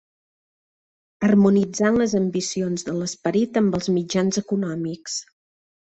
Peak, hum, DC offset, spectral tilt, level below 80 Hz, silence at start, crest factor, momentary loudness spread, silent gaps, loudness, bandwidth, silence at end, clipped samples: -6 dBFS; none; under 0.1%; -5.5 dB/octave; -58 dBFS; 1.2 s; 16 dB; 10 LU; none; -22 LUFS; 8.2 kHz; 0.7 s; under 0.1%